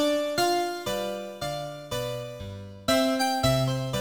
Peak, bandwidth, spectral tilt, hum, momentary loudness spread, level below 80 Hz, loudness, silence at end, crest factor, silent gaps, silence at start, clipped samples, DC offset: -10 dBFS; over 20 kHz; -4.5 dB/octave; none; 11 LU; -50 dBFS; -27 LUFS; 0 s; 18 dB; none; 0 s; under 0.1%; 0.1%